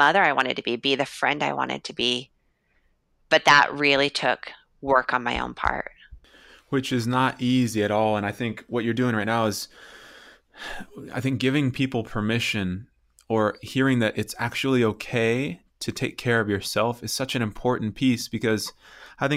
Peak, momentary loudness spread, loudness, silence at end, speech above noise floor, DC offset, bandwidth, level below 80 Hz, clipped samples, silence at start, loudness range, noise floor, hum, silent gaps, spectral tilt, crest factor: -4 dBFS; 12 LU; -24 LUFS; 0 s; 43 dB; under 0.1%; 16 kHz; -52 dBFS; under 0.1%; 0 s; 5 LU; -67 dBFS; none; none; -4.5 dB/octave; 20 dB